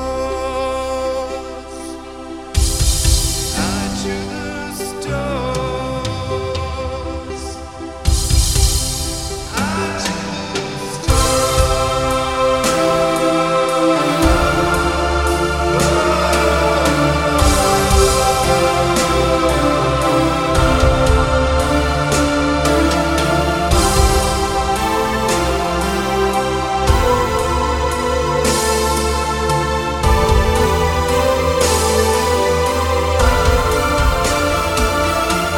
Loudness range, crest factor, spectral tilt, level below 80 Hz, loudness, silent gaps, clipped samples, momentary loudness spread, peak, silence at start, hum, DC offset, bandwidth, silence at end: 5 LU; 16 dB; -4.5 dB/octave; -22 dBFS; -16 LUFS; none; under 0.1%; 9 LU; 0 dBFS; 0 s; none; 0.4%; 18 kHz; 0 s